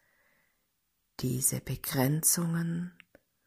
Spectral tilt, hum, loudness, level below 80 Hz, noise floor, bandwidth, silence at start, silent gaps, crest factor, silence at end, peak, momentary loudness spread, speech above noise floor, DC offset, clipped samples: -4 dB/octave; none; -29 LUFS; -60 dBFS; -78 dBFS; 16 kHz; 1.2 s; none; 22 dB; 0.55 s; -12 dBFS; 12 LU; 48 dB; under 0.1%; under 0.1%